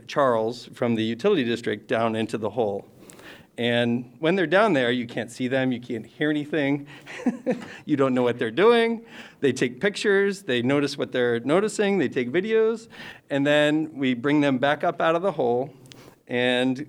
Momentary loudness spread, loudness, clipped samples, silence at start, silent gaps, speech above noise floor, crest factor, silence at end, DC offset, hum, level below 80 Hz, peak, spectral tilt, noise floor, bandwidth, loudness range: 10 LU; -24 LUFS; under 0.1%; 0.1 s; none; 23 dB; 16 dB; 0 s; under 0.1%; none; -70 dBFS; -6 dBFS; -5.5 dB/octave; -46 dBFS; 13 kHz; 3 LU